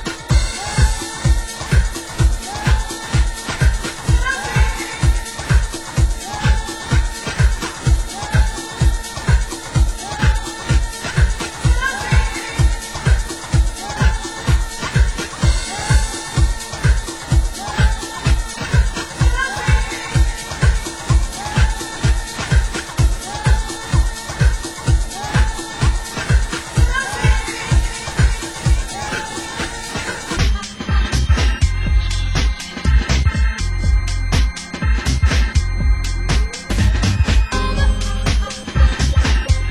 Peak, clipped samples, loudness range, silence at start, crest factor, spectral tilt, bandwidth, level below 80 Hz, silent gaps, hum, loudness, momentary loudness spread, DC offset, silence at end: -2 dBFS; under 0.1%; 1 LU; 0 s; 14 dB; -4.5 dB/octave; 12.5 kHz; -18 dBFS; none; none; -19 LUFS; 5 LU; under 0.1%; 0 s